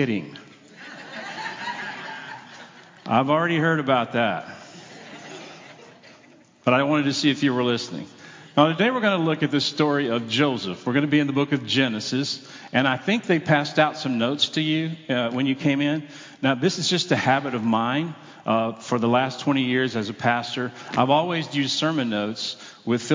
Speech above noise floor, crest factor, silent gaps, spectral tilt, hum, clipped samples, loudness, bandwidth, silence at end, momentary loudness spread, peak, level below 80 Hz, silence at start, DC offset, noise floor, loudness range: 30 dB; 20 dB; none; -5 dB/octave; none; under 0.1%; -23 LUFS; 7.6 kHz; 0 s; 18 LU; -4 dBFS; -70 dBFS; 0 s; under 0.1%; -52 dBFS; 4 LU